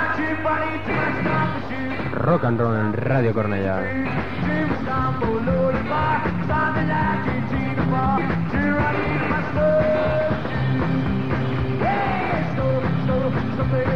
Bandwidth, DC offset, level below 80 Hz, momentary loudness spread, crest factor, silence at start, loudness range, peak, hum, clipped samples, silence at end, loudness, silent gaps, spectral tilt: 6.6 kHz; 2%; -38 dBFS; 4 LU; 14 dB; 0 s; 1 LU; -6 dBFS; none; under 0.1%; 0 s; -22 LUFS; none; -9 dB/octave